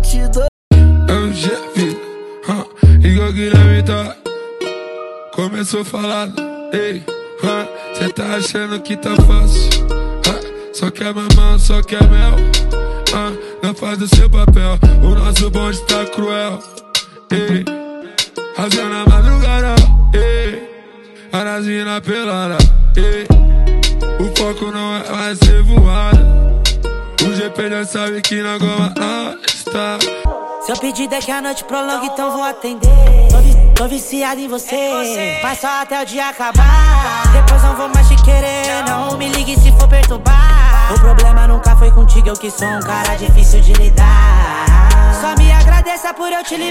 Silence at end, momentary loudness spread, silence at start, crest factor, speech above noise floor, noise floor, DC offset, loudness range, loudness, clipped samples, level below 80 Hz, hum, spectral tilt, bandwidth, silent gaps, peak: 0 s; 11 LU; 0 s; 10 dB; 28 dB; -37 dBFS; under 0.1%; 6 LU; -14 LUFS; under 0.1%; -12 dBFS; none; -5 dB/octave; 15 kHz; 0.48-0.71 s; 0 dBFS